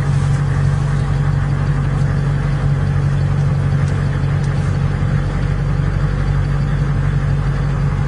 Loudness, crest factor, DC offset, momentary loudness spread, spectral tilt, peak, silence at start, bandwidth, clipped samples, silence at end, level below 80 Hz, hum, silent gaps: -17 LUFS; 12 dB; under 0.1%; 2 LU; -8 dB/octave; -4 dBFS; 0 s; 10 kHz; under 0.1%; 0 s; -24 dBFS; none; none